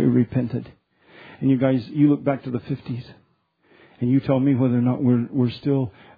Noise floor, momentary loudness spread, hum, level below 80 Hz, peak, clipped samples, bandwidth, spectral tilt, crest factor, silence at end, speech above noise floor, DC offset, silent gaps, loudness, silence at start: -64 dBFS; 10 LU; none; -58 dBFS; -4 dBFS; under 0.1%; 5 kHz; -11.5 dB/octave; 16 dB; 0.3 s; 43 dB; under 0.1%; none; -22 LUFS; 0 s